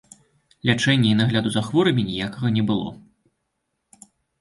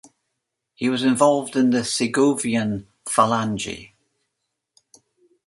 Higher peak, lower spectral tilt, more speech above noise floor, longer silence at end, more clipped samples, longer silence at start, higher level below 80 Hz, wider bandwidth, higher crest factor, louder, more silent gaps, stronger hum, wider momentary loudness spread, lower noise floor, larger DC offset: about the same, -4 dBFS vs -2 dBFS; first, -6 dB/octave vs -4.5 dB/octave; about the same, 56 dB vs 59 dB; second, 1.4 s vs 1.6 s; neither; second, 0.65 s vs 0.8 s; about the same, -54 dBFS vs -58 dBFS; about the same, 11.5 kHz vs 11.5 kHz; about the same, 18 dB vs 20 dB; about the same, -21 LUFS vs -21 LUFS; neither; neither; about the same, 8 LU vs 10 LU; about the same, -76 dBFS vs -79 dBFS; neither